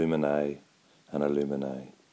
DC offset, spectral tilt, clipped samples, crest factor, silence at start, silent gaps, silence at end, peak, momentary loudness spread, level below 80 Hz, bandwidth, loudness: under 0.1%; -8 dB/octave; under 0.1%; 16 dB; 0 s; none; 0.2 s; -14 dBFS; 13 LU; -62 dBFS; 8 kHz; -30 LUFS